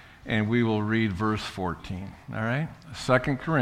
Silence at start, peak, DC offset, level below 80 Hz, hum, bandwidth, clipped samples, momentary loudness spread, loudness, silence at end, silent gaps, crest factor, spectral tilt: 0 s; -6 dBFS; under 0.1%; -50 dBFS; none; 13 kHz; under 0.1%; 12 LU; -27 LUFS; 0 s; none; 20 dB; -6.5 dB/octave